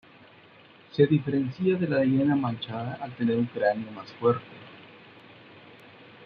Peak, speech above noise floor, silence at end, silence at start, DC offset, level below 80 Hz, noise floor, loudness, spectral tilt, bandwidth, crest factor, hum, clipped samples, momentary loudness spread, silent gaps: -8 dBFS; 28 dB; 0 s; 0.95 s; under 0.1%; -68 dBFS; -54 dBFS; -26 LUFS; -9.5 dB/octave; 5.4 kHz; 20 dB; none; under 0.1%; 16 LU; none